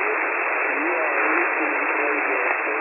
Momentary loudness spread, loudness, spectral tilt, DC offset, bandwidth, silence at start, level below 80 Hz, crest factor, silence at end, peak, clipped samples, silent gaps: 2 LU; -21 LUFS; -7 dB/octave; under 0.1%; 3 kHz; 0 s; under -90 dBFS; 16 dB; 0 s; -6 dBFS; under 0.1%; none